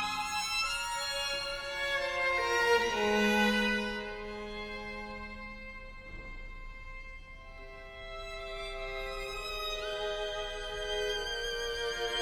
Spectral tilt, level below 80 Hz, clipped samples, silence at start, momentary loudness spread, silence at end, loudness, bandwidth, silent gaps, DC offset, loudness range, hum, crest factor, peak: -2.5 dB/octave; -48 dBFS; under 0.1%; 0 s; 20 LU; 0 s; -33 LUFS; over 20 kHz; none; under 0.1%; 15 LU; none; 18 dB; -16 dBFS